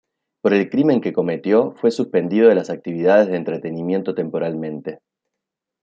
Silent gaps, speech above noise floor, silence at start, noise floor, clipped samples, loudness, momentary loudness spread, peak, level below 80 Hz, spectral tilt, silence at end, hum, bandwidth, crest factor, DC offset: none; 65 dB; 0.45 s; -83 dBFS; under 0.1%; -19 LUFS; 11 LU; -2 dBFS; -68 dBFS; -7.5 dB/octave; 0.85 s; none; 7.8 kHz; 16 dB; under 0.1%